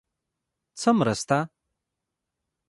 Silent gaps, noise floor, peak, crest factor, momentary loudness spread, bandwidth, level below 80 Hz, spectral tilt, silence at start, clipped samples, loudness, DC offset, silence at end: none; -84 dBFS; -8 dBFS; 22 dB; 6 LU; 11.5 kHz; -64 dBFS; -5.5 dB/octave; 0.75 s; under 0.1%; -24 LUFS; under 0.1%; 1.2 s